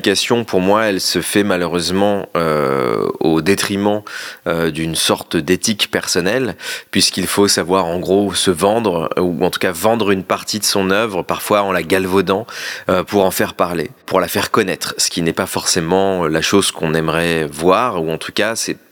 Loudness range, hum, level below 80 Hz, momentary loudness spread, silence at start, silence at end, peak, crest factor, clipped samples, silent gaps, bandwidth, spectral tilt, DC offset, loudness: 2 LU; none; -52 dBFS; 5 LU; 0 s; 0.15 s; 0 dBFS; 16 dB; under 0.1%; none; 19.5 kHz; -3.5 dB/octave; under 0.1%; -16 LUFS